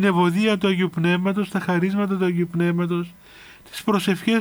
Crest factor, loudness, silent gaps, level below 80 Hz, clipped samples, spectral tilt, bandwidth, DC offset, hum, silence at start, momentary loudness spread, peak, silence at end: 14 dB; -21 LUFS; none; -60 dBFS; under 0.1%; -6.5 dB/octave; over 20 kHz; under 0.1%; none; 0 s; 7 LU; -8 dBFS; 0 s